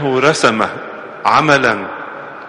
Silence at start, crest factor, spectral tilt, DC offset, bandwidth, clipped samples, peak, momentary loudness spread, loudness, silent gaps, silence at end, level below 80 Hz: 0 s; 16 dB; -4 dB/octave; under 0.1%; 11.5 kHz; under 0.1%; 0 dBFS; 17 LU; -13 LUFS; none; 0 s; -54 dBFS